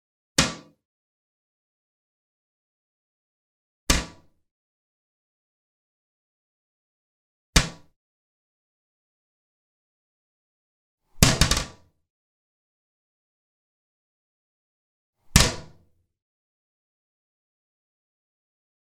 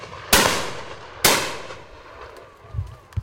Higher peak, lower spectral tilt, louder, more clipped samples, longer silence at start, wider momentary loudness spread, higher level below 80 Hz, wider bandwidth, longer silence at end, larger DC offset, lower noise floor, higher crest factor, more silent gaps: about the same, 0 dBFS vs 0 dBFS; about the same, -3 dB/octave vs -2 dB/octave; second, -22 LUFS vs -19 LUFS; neither; first, 0.4 s vs 0 s; second, 19 LU vs 24 LU; about the same, -38 dBFS vs -42 dBFS; about the same, 17 kHz vs 16.5 kHz; first, 3.2 s vs 0 s; neither; first, -60 dBFS vs -43 dBFS; first, 32 dB vs 24 dB; first, 0.85-3.87 s, 4.51-7.53 s, 7.96-10.98 s, 12.10-15.13 s vs none